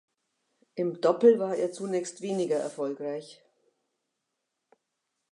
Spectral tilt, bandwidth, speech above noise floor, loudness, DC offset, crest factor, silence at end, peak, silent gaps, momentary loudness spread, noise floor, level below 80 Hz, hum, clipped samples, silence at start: -5.5 dB/octave; 11 kHz; 56 dB; -28 LUFS; under 0.1%; 22 dB; 2 s; -8 dBFS; none; 14 LU; -83 dBFS; -86 dBFS; none; under 0.1%; 0.75 s